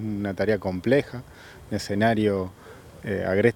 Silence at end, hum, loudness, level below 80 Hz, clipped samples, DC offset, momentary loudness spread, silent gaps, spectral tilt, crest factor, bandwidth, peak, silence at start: 0 s; none; -25 LUFS; -54 dBFS; under 0.1%; under 0.1%; 23 LU; none; -6.5 dB/octave; 20 dB; 19 kHz; -4 dBFS; 0 s